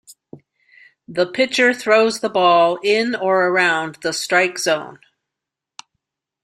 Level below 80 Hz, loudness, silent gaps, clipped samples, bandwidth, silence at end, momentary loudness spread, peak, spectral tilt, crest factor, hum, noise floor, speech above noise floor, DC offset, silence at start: -66 dBFS; -17 LUFS; none; under 0.1%; 15.5 kHz; 1.5 s; 9 LU; -2 dBFS; -3 dB/octave; 18 dB; none; -84 dBFS; 67 dB; under 0.1%; 0.1 s